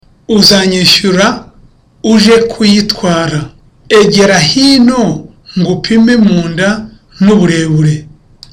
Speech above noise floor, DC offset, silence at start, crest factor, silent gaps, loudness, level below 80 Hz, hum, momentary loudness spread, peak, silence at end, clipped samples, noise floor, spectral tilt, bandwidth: 34 dB; under 0.1%; 0.3 s; 8 dB; none; -8 LUFS; -36 dBFS; none; 11 LU; 0 dBFS; 0.45 s; under 0.1%; -42 dBFS; -4.5 dB/octave; 16.5 kHz